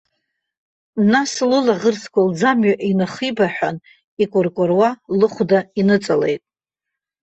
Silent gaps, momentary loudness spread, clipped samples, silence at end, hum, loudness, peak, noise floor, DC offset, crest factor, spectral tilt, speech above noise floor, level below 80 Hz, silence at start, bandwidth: 4.04-4.17 s; 7 LU; under 0.1%; 0.85 s; none; -18 LUFS; -2 dBFS; -83 dBFS; under 0.1%; 16 dB; -5.5 dB/octave; 67 dB; -60 dBFS; 0.95 s; 8.4 kHz